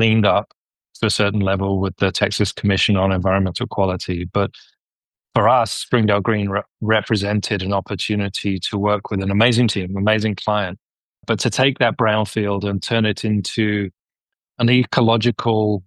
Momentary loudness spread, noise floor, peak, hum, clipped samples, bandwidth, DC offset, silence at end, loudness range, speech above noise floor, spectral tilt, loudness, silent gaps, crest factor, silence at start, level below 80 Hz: 6 LU; under -90 dBFS; -2 dBFS; none; under 0.1%; 12.5 kHz; under 0.1%; 0.05 s; 1 LU; over 72 dB; -5.5 dB/octave; -19 LUFS; 0.59-0.65 s, 4.80-5.10 s, 10.85-10.89 s, 11.00-11.13 s; 18 dB; 0 s; -50 dBFS